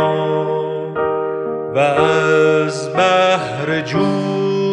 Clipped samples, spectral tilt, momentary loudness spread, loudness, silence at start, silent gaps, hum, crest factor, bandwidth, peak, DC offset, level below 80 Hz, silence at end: under 0.1%; -5.5 dB/octave; 7 LU; -16 LUFS; 0 s; none; none; 16 dB; 10.5 kHz; 0 dBFS; under 0.1%; -54 dBFS; 0 s